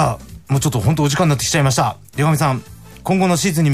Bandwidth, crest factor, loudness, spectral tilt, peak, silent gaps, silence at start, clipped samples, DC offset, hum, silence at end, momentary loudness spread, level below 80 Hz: 15.5 kHz; 12 dB; -17 LUFS; -5 dB/octave; -4 dBFS; none; 0 s; under 0.1%; 0.3%; none; 0 s; 6 LU; -40 dBFS